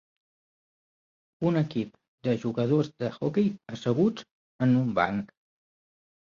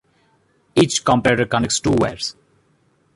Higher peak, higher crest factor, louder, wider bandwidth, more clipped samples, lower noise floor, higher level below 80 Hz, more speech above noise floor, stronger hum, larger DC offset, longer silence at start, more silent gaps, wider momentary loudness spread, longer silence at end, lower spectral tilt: second, -10 dBFS vs -2 dBFS; about the same, 20 dB vs 18 dB; second, -28 LUFS vs -18 LUFS; second, 7.2 kHz vs 11.5 kHz; neither; first, under -90 dBFS vs -61 dBFS; second, -64 dBFS vs -46 dBFS; first, over 64 dB vs 43 dB; neither; neither; first, 1.4 s vs 0.75 s; first, 2.08-2.18 s, 4.31-4.59 s vs none; first, 10 LU vs 7 LU; about the same, 0.95 s vs 0.85 s; first, -8 dB/octave vs -4 dB/octave